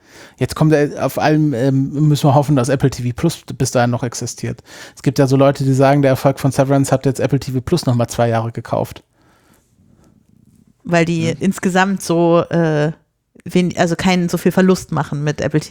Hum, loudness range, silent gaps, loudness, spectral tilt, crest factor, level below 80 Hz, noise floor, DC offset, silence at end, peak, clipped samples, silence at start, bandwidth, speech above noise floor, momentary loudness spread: none; 6 LU; none; -16 LUFS; -6.5 dB/octave; 16 dB; -46 dBFS; -53 dBFS; under 0.1%; 0 s; 0 dBFS; under 0.1%; 0.2 s; 18.5 kHz; 38 dB; 9 LU